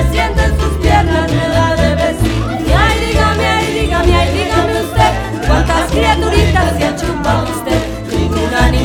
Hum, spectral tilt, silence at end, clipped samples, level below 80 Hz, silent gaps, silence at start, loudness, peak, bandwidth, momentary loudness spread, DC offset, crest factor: none; -5.5 dB/octave; 0 s; under 0.1%; -18 dBFS; none; 0 s; -13 LUFS; 0 dBFS; 17.5 kHz; 5 LU; under 0.1%; 12 dB